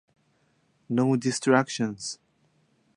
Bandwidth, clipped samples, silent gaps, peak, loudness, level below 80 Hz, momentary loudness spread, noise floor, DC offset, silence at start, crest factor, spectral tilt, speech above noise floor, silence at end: 11.5 kHz; under 0.1%; none; -4 dBFS; -26 LUFS; -72 dBFS; 13 LU; -68 dBFS; under 0.1%; 0.9 s; 24 dB; -5 dB/octave; 43 dB; 0.8 s